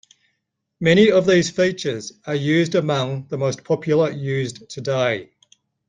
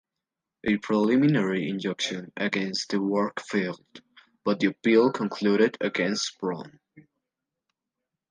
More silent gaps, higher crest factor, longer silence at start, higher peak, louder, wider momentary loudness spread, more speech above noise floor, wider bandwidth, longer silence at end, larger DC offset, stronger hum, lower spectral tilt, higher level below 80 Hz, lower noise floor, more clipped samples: neither; about the same, 18 dB vs 18 dB; first, 0.8 s vs 0.65 s; first, -2 dBFS vs -8 dBFS; first, -20 LUFS vs -26 LUFS; about the same, 12 LU vs 11 LU; second, 56 dB vs 62 dB; about the same, 9.6 kHz vs 9.8 kHz; second, 0.65 s vs 1.3 s; neither; neither; about the same, -5.5 dB/octave vs -5 dB/octave; first, -58 dBFS vs -68 dBFS; second, -75 dBFS vs -87 dBFS; neither